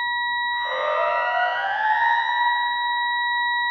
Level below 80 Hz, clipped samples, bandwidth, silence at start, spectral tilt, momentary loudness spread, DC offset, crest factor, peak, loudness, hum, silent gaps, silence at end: -66 dBFS; under 0.1%; 6.4 kHz; 0 s; -0.5 dB/octave; 3 LU; under 0.1%; 14 dB; -10 dBFS; -21 LUFS; none; none; 0 s